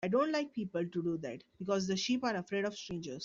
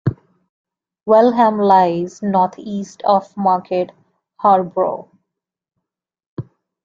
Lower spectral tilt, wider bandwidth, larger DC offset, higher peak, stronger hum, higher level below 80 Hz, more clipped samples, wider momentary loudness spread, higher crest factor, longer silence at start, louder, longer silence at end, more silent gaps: second, -5 dB/octave vs -7.5 dB/octave; about the same, 7.6 kHz vs 7.6 kHz; neither; second, -20 dBFS vs -2 dBFS; neither; second, -70 dBFS vs -58 dBFS; neither; second, 10 LU vs 18 LU; about the same, 14 dB vs 16 dB; about the same, 0 s vs 0.05 s; second, -36 LUFS vs -16 LUFS; second, 0 s vs 0.4 s; second, none vs 0.49-0.65 s, 6.26-6.37 s